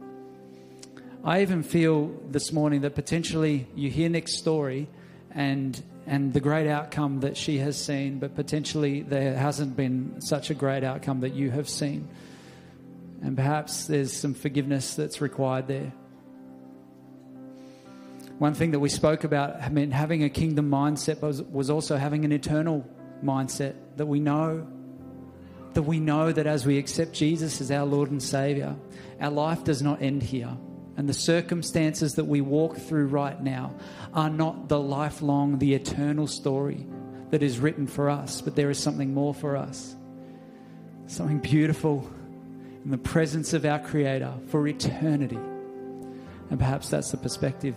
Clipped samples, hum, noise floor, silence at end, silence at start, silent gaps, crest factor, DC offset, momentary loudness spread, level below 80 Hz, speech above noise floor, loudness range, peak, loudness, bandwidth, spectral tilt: under 0.1%; none; -49 dBFS; 0 s; 0 s; none; 20 dB; under 0.1%; 19 LU; -54 dBFS; 23 dB; 4 LU; -8 dBFS; -27 LUFS; 15.5 kHz; -6 dB/octave